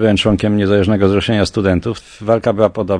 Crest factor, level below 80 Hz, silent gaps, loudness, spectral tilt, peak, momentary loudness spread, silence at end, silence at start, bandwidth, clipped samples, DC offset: 14 dB; -38 dBFS; none; -15 LUFS; -6.5 dB/octave; 0 dBFS; 5 LU; 0 s; 0 s; 10 kHz; under 0.1%; under 0.1%